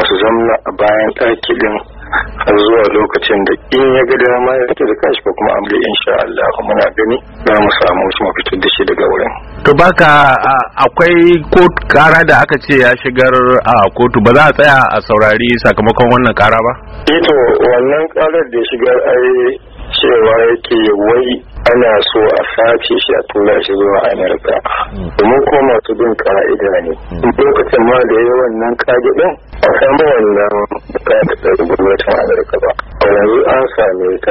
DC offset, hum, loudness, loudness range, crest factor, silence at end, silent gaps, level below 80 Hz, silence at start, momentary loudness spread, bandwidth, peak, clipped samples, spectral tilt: under 0.1%; none; -10 LUFS; 4 LU; 10 dB; 0 s; none; -32 dBFS; 0 s; 7 LU; 9 kHz; 0 dBFS; 0.5%; -6.5 dB/octave